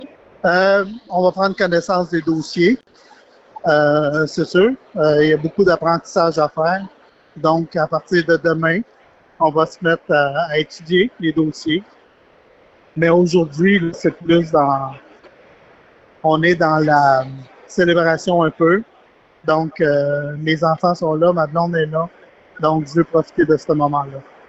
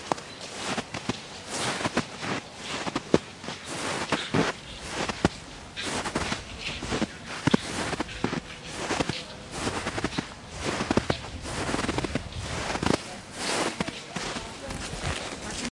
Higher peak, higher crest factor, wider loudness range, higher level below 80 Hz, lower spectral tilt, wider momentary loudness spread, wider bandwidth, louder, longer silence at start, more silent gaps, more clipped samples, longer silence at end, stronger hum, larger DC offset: about the same, -4 dBFS vs -2 dBFS; second, 14 dB vs 28 dB; about the same, 3 LU vs 1 LU; second, -54 dBFS vs -48 dBFS; first, -6.5 dB/octave vs -4 dB/octave; about the same, 7 LU vs 8 LU; second, 8.2 kHz vs 11.5 kHz; first, -17 LUFS vs -30 LUFS; about the same, 0 s vs 0 s; neither; neither; first, 0.25 s vs 0.05 s; neither; neither